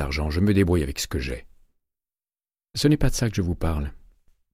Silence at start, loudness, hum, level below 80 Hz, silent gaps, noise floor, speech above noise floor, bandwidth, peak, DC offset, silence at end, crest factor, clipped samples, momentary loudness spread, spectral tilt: 0 s; -24 LUFS; none; -34 dBFS; none; under -90 dBFS; over 67 dB; 16 kHz; -6 dBFS; under 0.1%; 0.65 s; 18 dB; under 0.1%; 13 LU; -5.5 dB/octave